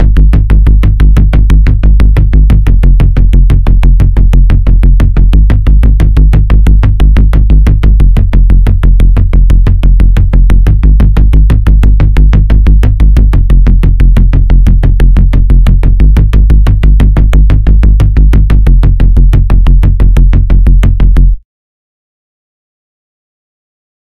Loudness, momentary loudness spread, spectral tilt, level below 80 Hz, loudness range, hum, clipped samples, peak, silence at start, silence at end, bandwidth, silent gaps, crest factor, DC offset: -7 LUFS; 1 LU; -8.5 dB/octave; -4 dBFS; 1 LU; none; 10%; 0 dBFS; 0 s; 2.65 s; 4 kHz; none; 4 dB; under 0.1%